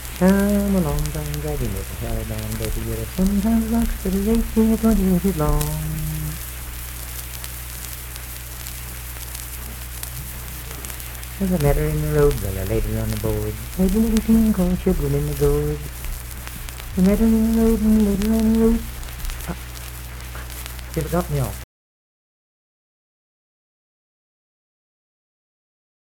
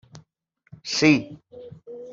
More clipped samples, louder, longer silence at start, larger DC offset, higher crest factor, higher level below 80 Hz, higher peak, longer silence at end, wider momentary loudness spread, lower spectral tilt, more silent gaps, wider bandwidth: neither; about the same, -22 LUFS vs -20 LUFS; second, 0 s vs 0.15 s; neither; about the same, 20 dB vs 22 dB; first, -30 dBFS vs -64 dBFS; about the same, -2 dBFS vs -4 dBFS; first, 4.4 s vs 0 s; second, 14 LU vs 25 LU; first, -6 dB/octave vs -4.5 dB/octave; neither; first, 19 kHz vs 7.8 kHz